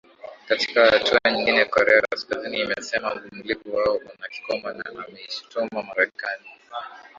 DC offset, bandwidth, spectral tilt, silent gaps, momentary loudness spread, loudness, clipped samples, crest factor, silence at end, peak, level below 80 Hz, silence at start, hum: under 0.1%; 7.6 kHz; -3 dB/octave; none; 19 LU; -22 LUFS; under 0.1%; 22 dB; 0.15 s; -2 dBFS; -60 dBFS; 0.25 s; none